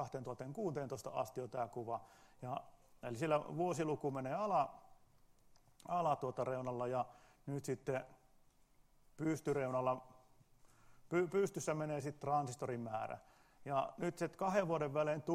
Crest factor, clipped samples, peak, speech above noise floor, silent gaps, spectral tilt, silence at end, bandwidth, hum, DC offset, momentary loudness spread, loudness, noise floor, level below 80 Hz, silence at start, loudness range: 20 dB; under 0.1%; -20 dBFS; 30 dB; none; -6.5 dB/octave; 0 s; 15.5 kHz; none; under 0.1%; 10 LU; -41 LUFS; -69 dBFS; -74 dBFS; 0 s; 3 LU